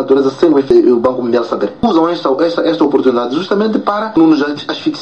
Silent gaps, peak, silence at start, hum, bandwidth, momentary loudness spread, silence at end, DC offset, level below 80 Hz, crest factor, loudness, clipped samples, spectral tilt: none; 0 dBFS; 0 s; none; 8 kHz; 6 LU; 0 s; 0.3%; -48 dBFS; 12 dB; -12 LUFS; under 0.1%; -6.5 dB/octave